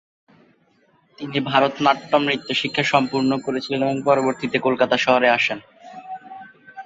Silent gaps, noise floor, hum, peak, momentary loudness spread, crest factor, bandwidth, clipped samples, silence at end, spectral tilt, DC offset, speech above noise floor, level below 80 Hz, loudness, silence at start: none; -60 dBFS; none; -2 dBFS; 19 LU; 20 dB; 7.8 kHz; under 0.1%; 0 s; -5 dB/octave; under 0.1%; 40 dB; -62 dBFS; -19 LUFS; 1.2 s